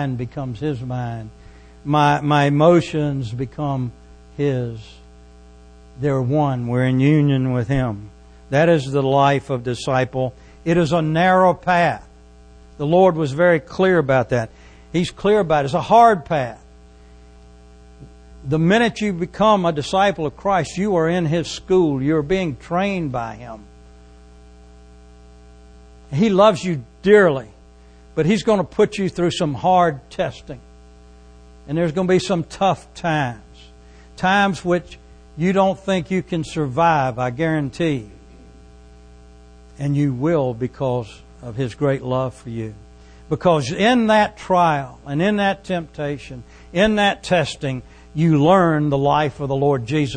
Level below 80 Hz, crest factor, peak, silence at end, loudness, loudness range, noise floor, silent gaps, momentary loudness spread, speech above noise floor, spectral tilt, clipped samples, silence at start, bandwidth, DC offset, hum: -44 dBFS; 18 dB; 0 dBFS; 0 s; -19 LUFS; 6 LU; -46 dBFS; none; 13 LU; 28 dB; -6.5 dB/octave; under 0.1%; 0 s; 9.8 kHz; under 0.1%; 60 Hz at -45 dBFS